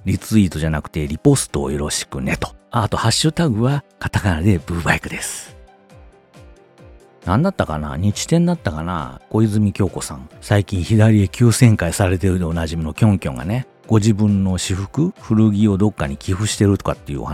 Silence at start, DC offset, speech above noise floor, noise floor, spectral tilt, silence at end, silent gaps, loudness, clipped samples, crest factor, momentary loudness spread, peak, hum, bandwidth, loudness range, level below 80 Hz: 0.05 s; under 0.1%; 28 dB; -45 dBFS; -6 dB/octave; 0 s; none; -18 LUFS; under 0.1%; 18 dB; 10 LU; 0 dBFS; none; 15.5 kHz; 6 LU; -38 dBFS